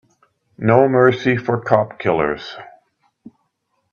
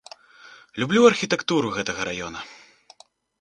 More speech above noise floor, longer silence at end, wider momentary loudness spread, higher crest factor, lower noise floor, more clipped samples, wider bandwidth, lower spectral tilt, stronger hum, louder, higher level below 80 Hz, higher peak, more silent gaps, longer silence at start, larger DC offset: first, 53 dB vs 32 dB; first, 1.3 s vs 0.85 s; second, 14 LU vs 20 LU; second, 18 dB vs 24 dB; first, -70 dBFS vs -53 dBFS; neither; second, 7 kHz vs 9.6 kHz; first, -8 dB/octave vs -4 dB/octave; neither; first, -17 LUFS vs -22 LUFS; first, -54 dBFS vs -60 dBFS; about the same, 0 dBFS vs -2 dBFS; neither; first, 0.6 s vs 0.45 s; neither